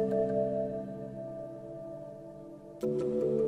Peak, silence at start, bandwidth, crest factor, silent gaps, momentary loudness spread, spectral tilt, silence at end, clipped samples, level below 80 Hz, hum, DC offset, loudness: -18 dBFS; 0 s; 12 kHz; 14 dB; none; 17 LU; -9 dB/octave; 0 s; under 0.1%; -64 dBFS; none; under 0.1%; -35 LUFS